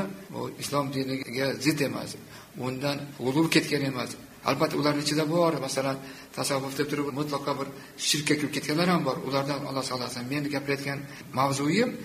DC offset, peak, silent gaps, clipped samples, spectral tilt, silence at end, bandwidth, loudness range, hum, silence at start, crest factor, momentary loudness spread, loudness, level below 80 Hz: under 0.1%; -6 dBFS; none; under 0.1%; -4.5 dB/octave; 0 s; 15.5 kHz; 2 LU; none; 0 s; 22 dB; 11 LU; -28 LUFS; -64 dBFS